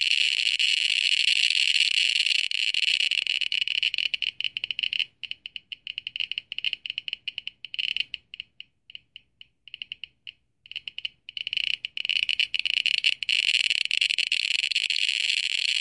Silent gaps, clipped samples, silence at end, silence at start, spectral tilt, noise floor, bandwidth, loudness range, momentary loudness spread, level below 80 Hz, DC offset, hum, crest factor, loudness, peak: none; under 0.1%; 0 s; 0 s; 4.5 dB/octave; -56 dBFS; 11.5 kHz; 13 LU; 17 LU; -74 dBFS; under 0.1%; none; 22 dB; -23 LUFS; -6 dBFS